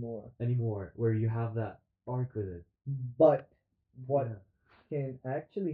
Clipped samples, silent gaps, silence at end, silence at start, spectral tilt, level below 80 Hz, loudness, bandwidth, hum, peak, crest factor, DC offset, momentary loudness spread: under 0.1%; none; 0 s; 0 s; -10 dB/octave; -68 dBFS; -33 LUFS; 4 kHz; none; -10 dBFS; 22 dB; under 0.1%; 16 LU